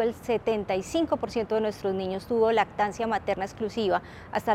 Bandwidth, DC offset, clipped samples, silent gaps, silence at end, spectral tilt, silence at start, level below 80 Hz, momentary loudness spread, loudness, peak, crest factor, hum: 15 kHz; under 0.1%; under 0.1%; none; 0 s; -5.5 dB/octave; 0 s; -54 dBFS; 7 LU; -28 LUFS; -10 dBFS; 18 dB; none